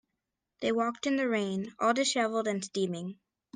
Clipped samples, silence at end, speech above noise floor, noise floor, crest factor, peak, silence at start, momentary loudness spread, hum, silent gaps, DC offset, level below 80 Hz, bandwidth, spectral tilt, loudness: under 0.1%; 0.4 s; 55 dB; -86 dBFS; 18 dB; -14 dBFS; 0.6 s; 7 LU; none; none; under 0.1%; -74 dBFS; 10 kHz; -4 dB/octave; -30 LUFS